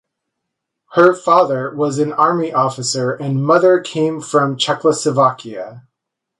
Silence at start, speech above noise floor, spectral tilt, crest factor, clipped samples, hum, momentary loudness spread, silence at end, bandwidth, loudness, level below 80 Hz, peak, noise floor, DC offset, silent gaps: 0.9 s; 64 dB; -5 dB/octave; 16 dB; under 0.1%; none; 7 LU; 0.6 s; 11.5 kHz; -15 LUFS; -64 dBFS; 0 dBFS; -79 dBFS; under 0.1%; none